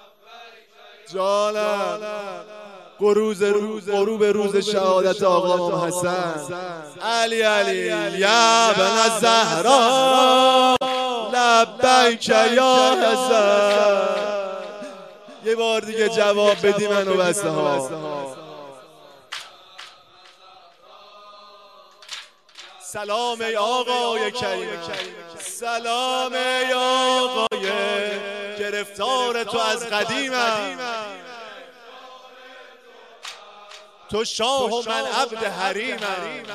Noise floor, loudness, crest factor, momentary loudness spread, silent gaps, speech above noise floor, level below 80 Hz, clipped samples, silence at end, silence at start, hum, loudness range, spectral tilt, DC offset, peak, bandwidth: -50 dBFS; -20 LUFS; 20 dB; 19 LU; none; 30 dB; -66 dBFS; under 0.1%; 0 s; 0.3 s; none; 13 LU; -2.5 dB/octave; under 0.1%; -2 dBFS; 15 kHz